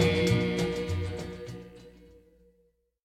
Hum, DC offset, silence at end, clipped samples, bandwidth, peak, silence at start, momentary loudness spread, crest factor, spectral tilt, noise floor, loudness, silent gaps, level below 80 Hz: none; under 0.1%; 1 s; under 0.1%; 15 kHz; -10 dBFS; 0 s; 21 LU; 20 dB; -6 dB/octave; -70 dBFS; -30 LUFS; none; -48 dBFS